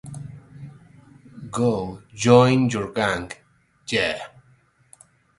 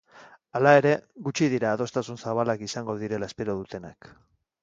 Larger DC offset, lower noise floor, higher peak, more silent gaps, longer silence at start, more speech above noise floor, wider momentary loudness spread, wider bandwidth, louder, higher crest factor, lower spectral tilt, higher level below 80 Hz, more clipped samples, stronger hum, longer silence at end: neither; first, -59 dBFS vs -53 dBFS; about the same, 0 dBFS vs -2 dBFS; neither; about the same, 0.05 s vs 0.15 s; first, 39 dB vs 27 dB; first, 27 LU vs 15 LU; first, 11.5 kHz vs 7.8 kHz; first, -21 LUFS vs -25 LUFS; about the same, 24 dB vs 24 dB; about the same, -5.5 dB/octave vs -5.5 dB/octave; first, -54 dBFS vs -62 dBFS; neither; neither; first, 1.1 s vs 0.7 s